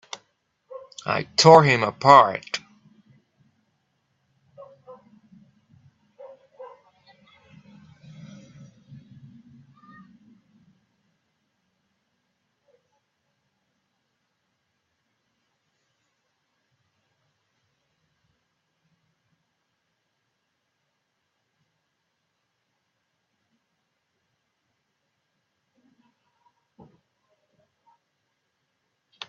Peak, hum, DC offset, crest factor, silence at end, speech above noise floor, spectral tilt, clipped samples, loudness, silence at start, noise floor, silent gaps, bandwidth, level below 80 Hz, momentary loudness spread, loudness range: 0 dBFS; none; under 0.1%; 28 dB; 26.7 s; 61 dB; -3.5 dB/octave; under 0.1%; -17 LUFS; 0.75 s; -77 dBFS; none; 7.6 kHz; -72 dBFS; 30 LU; 17 LU